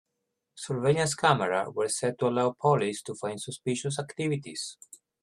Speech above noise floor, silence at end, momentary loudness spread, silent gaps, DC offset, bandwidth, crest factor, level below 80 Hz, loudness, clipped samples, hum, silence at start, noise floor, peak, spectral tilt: 54 dB; 0.5 s; 12 LU; none; under 0.1%; 13 kHz; 22 dB; -68 dBFS; -28 LUFS; under 0.1%; none; 0.55 s; -82 dBFS; -6 dBFS; -4.5 dB/octave